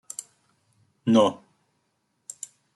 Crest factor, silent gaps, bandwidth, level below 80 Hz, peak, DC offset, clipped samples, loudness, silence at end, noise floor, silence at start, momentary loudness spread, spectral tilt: 22 dB; none; 12 kHz; -74 dBFS; -6 dBFS; under 0.1%; under 0.1%; -22 LUFS; 1.4 s; -74 dBFS; 1.05 s; 24 LU; -5 dB/octave